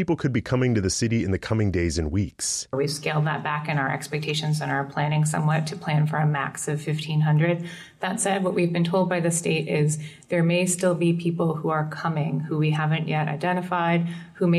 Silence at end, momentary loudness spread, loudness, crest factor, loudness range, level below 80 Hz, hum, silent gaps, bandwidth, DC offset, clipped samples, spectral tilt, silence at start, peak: 0 s; 5 LU; -24 LUFS; 12 dB; 2 LU; -48 dBFS; none; none; 13 kHz; under 0.1%; under 0.1%; -5.5 dB/octave; 0 s; -12 dBFS